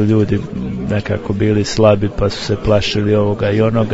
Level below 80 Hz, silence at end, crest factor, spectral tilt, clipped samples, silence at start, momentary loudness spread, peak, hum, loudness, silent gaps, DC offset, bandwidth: -32 dBFS; 0 s; 14 dB; -6.5 dB/octave; under 0.1%; 0 s; 7 LU; 0 dBFS; none; -16 LUFS; none; under 0.1%; 8 kHz